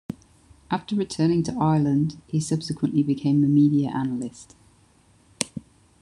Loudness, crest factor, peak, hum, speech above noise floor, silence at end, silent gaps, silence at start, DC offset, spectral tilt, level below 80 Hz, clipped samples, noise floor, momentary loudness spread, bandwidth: -23 LUFS; 22 dB; -2 dBFS; none; 36 dB; 0.4 s; none; 0.1 s; under 0.1%; -6.5 dB/octave; -56 dBFS; under 0.1%; -58 dBFS; 12 LU; 11 kHz